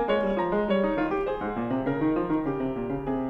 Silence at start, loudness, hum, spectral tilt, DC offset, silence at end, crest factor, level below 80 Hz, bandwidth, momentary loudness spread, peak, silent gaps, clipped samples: 0 s; -27 LUFS; none; -9 dB/octave; under 0.1%; 0 s; 14 dB; -46 dBFS; 5.6 kHz; 5 LU; -14 dBFS; none; under 0.1%